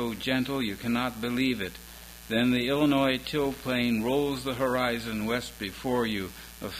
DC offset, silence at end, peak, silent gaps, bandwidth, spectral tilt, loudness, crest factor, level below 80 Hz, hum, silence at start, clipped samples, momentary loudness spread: under 0.1%; 0 s; -12 dBFS; none; 16.5 kHz; -5 dB/octave; -28 LUFS; 16 dB; -52 dBFS; none; 0 s; under 0.1%; 11 LU